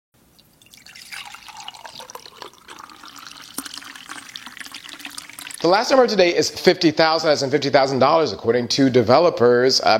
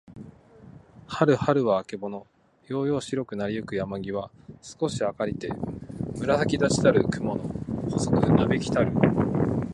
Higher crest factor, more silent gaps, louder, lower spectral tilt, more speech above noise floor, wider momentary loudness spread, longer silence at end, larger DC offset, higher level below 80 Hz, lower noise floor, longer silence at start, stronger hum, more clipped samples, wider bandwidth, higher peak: about the same, 20 dB vs 20 dB; neither; first, -17 LUFS vs -26 LUFS; second, -4 dB/octave vs -6.5 dB/octave; first, 38 dB vs 24 dB; first, 23 LU vs 14 LU; about the same, 0 s vs 0 s; neither; second, -60 dBFS vs -48 dBFS; first, -54 dBFS vs -49 dBFS; first, 0.95 s vs 0.1 s; neither; neither; first, 16.5 kHz vs 11.5 kHz; first, 0 dBFS vs -6 dBFS